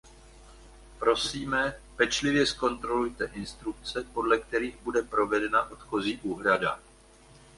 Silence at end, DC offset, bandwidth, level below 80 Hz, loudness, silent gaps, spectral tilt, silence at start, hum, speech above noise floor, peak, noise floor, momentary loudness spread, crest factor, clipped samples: 0.8 s; under 0.1%; 11.5 kHz; -52 dBFS; -28 LUFS; none; -3.5 dB/octave; 0.05 s; none; 27 dB; -8 dBFS; -55 dBFS; 9 LU; 20 dB; under 0.1%